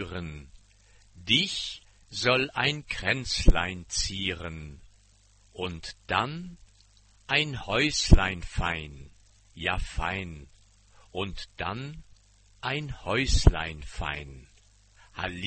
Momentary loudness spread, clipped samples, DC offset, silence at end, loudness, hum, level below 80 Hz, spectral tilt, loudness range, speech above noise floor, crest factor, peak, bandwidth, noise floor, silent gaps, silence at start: 19 LU; under 0.1%; under 0.1%; 0 s; -28 LUFS; none; -32 dBFS; -4 dB/octave; 8 LU; 33 dB; 26 dB; -2 dBFS; 8.8 kHz; -60 dBFS; none; 0 s